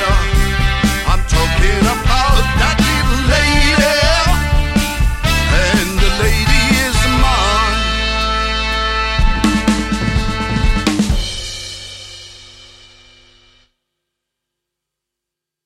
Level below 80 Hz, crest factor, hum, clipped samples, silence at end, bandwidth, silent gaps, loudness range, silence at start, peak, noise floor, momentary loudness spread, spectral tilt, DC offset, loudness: -18 dBFS; 14 dB; none; under 0.1%; 3.2 s; 16.5 kHz; none; 8 LU; 0 s; 0 dBFS; -82 dBFS; 6 LU; -4 dB/octave; under 0.1%; -14 LUFS